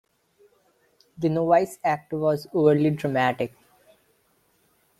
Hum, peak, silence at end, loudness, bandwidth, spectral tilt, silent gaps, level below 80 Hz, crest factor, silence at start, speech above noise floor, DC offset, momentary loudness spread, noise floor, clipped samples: none; -6 dBFS; 1.55 s; -23 LUFS; 14.5 kHz; -7.5 dB/octave; none; -64 dBFS; 20 dB; 1.2 s; 43 dB; under 0.1%; 8 LU; -66 dBFS; under 0.1%